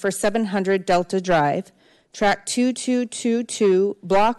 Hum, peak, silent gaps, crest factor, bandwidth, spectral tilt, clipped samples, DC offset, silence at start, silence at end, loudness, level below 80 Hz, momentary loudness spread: none; -10 dBFS; none; 10 dB; 12.5 kHz; -4.5 dB/octave; under 0.1%; under 0.1%; 0 s; 0.05 s; -21 LUFS; -50 dBFS; 4 LU